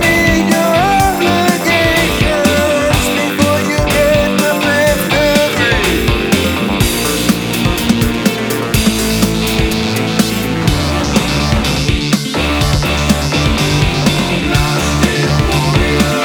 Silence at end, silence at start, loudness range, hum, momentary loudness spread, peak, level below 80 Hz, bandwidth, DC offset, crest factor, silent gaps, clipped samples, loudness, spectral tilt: 0 s; 0 s; 2 LU; none; 3 LU; 0 dBFS; -24 dBFS; over 20 kHz; under 0.1%; 12 dB; none; under 0.1%; -12 LUFS; -4.5 dB/octave